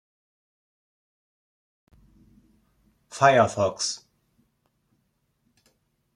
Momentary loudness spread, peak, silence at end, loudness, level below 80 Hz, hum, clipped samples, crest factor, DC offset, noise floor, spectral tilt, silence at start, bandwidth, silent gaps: 19 LU; -4 dBFS; 2.2 s; -22 LUFS; -68 dBFS; none; under 0.1%; 26 dB; under 0.1%; -73 dBFS; -4 dB/octave; 3.15 s; 11.5 kHz; none